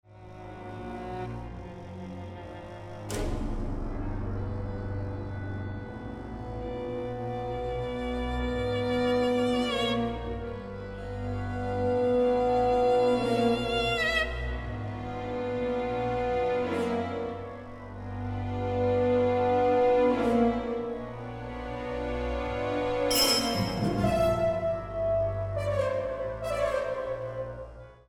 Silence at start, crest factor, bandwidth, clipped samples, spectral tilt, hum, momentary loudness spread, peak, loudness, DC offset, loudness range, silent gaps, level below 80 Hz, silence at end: 0.1 s; 18 dB; 16 kHz; under 0.1%; -5 dB/octave; none; 15 LU; -10 dBFS; -29 LUFS; under 0.1%; 10 LU; none; -42 dBFS; 0.15 s